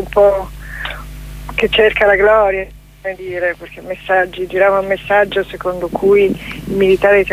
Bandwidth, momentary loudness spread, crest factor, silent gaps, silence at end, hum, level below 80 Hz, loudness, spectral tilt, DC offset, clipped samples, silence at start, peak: 15.5 kHz; 17 LU; 14 dB; none; 0 s; none; -34 dBFS; -14 LUFS; -5.5 dB/octave; under 0.1%; under 0.1%; 0 s; 0 dBFS